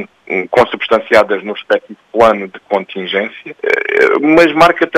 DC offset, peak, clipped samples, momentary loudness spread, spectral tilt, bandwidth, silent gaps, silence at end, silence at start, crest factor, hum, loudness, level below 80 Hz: under 0.1%; 0 dBFS; 0.2%; 11 LU; -5 dB/octave; 15.5 kHz; none; 0 s; 0 s; 12 dB; none; -12 LUFS; -48 dBFS